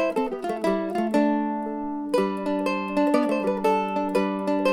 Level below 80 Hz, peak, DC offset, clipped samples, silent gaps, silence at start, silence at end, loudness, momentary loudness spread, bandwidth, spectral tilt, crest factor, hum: -58 dBFS; -8 dBFS; under 0.1%; under 0.1%; none; 0 s; 0 s; -25 LUFS; 6 LU; 13.5 kHz; -6.5 dB/octave; 16 dB; none